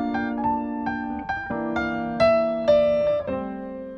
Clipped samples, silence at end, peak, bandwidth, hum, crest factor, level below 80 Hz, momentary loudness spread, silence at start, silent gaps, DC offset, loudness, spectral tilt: under 0.1%; 0 s; -8 dBFS; 7 kHz; none; 16 dB; -48 dBFS; 10 LU; 0 s; none; under 0.1%; -24 LUFS; -7 dB/octave